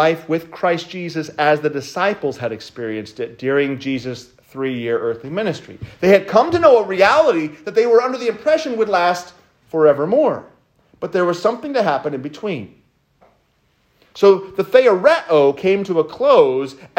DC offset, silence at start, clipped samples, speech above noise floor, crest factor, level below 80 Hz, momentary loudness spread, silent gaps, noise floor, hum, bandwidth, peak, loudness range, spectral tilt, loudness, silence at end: under 0.1%; 0 s; under 0.1%; 45 dB; 16 dB; -60 dBFS; 14 LU; none; -61 dBFS; none; 16 kHz; 0 dBFS; 8 LU; -5.5 dB/octave; -17 LUFS; 0.1 s